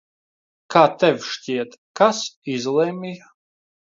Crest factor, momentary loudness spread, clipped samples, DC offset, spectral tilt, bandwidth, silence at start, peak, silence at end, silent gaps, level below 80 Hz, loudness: 22 dB; 16 LU; under 0.1%; under 0.1%; -4.5 dB/octave; 7.6 kHz; 0.7 s; 0 dBFS; 0.8 s; 1.78-1.94 s, 2.36-2.42 s; -72 dBFS; -20 LUFS